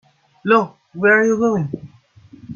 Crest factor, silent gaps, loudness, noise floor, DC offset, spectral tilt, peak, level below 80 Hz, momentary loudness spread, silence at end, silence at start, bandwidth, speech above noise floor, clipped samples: 18 dB; none; -16 LUFS; -46 dBFS; under 0.1%; -6.5 dB/octave; 0 dBFS; -60 dBFS; 15 LU; 0 s; 0.45 s; 7 kHz; 31 dB; under 0.1%